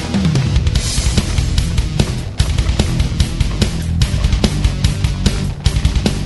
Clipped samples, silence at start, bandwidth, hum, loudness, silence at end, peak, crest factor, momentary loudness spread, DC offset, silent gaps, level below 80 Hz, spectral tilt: under 0.1%; 0 s; 12 kHz; none; -17 LUFS; 0 s; 0 dBFS; 14 dB; 2 LU; 0.3%; none; -18 dBFS; -5 dB/octave